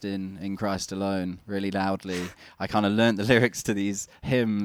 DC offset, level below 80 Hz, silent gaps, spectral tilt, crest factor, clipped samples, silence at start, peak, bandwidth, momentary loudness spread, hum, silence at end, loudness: under 0.1%; -56 dBFS; none; -5 dB/octave; 22 dB; under 0.1%; 0 s; -4 dBFS; 16.5 kHz; 12 LU; none; 0 s; -27 LUFS